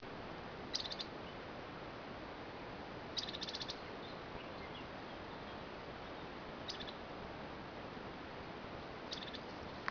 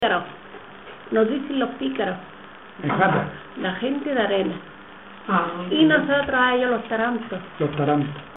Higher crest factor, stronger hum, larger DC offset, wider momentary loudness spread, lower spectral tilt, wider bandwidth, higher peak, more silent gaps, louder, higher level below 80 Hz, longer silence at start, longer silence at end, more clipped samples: first, 28 dB vs 18 dB; neither; second, under 0.1% vs 0.2%; second, 7 LU vs 22 LU; second, -2.5 dB/octave vs -9.5 dB/octave; first, 5.4 kHz vs 4 kHz; second, -20 dBFS vs -4 dBFS; neither; second, -46 LUFS vs -22 LUFS; second, -64 dBFS vs -58 dBFS; about the same, 0 s vs 0 s; about the same, 0 s vs 0 s; neither